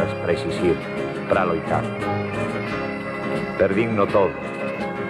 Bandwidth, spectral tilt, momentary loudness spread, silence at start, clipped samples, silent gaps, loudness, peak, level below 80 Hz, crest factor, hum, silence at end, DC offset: 12.5 kHz; -7 dB/octave; 8 LU; 0 s; under 0.1%; none; -23 LUFS; -6 dBFS; -48 dBFS; 18 dB; none; 0 s; under 0.1%